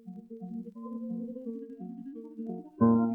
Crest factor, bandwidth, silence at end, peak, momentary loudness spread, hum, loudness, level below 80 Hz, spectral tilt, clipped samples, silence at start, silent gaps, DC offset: 20 dB; 1.7 kHz; 0 s; -12 dBFS; 17 LU; none; -35 LUFS; -72 dBFS; -12.5 dB/octave; under 0.1%; 0.05 s; none; under 0.1%